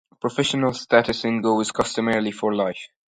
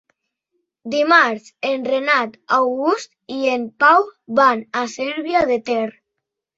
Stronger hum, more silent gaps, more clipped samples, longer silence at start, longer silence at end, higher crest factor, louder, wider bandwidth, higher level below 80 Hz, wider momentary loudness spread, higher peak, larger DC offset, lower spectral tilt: neither; neither; neither; second, 0.25 s vs 0.85 s; second, 0.2 s vs 0.7 s; about the same, 20 dB vs 18 dB; second, -22 LUFS vs -18 LUFS; first, 11 kHz vs 8 kHz; first, -56 dBFS vs -62 dBFS; second, 6 LU vs 11 LU; about the same, -2 dBFS vs -2 dBFS; neither; about the same, -4.5 dB/octave vs -3.5 dB/octave